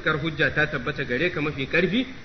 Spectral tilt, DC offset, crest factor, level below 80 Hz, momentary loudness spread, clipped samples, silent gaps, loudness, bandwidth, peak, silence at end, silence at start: -6.5 dB/octave; under 0.1%; 16 dB; -46 dBFS; 5 LU; under 0.1%; none; -24 LUFS; 6.4 kHz; -8 dBFS; 0 s; 0 s